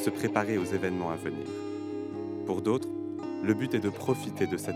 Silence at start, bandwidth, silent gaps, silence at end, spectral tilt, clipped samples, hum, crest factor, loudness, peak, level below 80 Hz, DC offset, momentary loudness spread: 0 s; 16 kHz; none; 0 s; -6 dB/octave; under 0.1%; none; 22 dB; -31 LUFS; -10 dBFS; -72 dBFS; under 0.1%; 8 LU